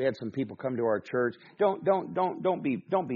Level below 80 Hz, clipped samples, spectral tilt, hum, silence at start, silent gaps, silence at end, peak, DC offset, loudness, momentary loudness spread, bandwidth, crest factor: -72 dBFS; under 0.1%; -6 dB/octave; none; 0 s; none; 0 s; -12 dBFS; under 0.1%; -30 LUFS; 6 LU; 6.8 kHz; 16 dB